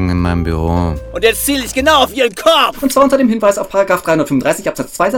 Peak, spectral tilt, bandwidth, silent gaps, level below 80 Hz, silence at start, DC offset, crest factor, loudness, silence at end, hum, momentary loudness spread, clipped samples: 0 dBFS; -4.5 dB/octave; 19 kHz; none; -30 dBFS; 0 s; under 0.1%; 12 dB; -13 LUFS; 0 s; none; 6 LU; under 0.1%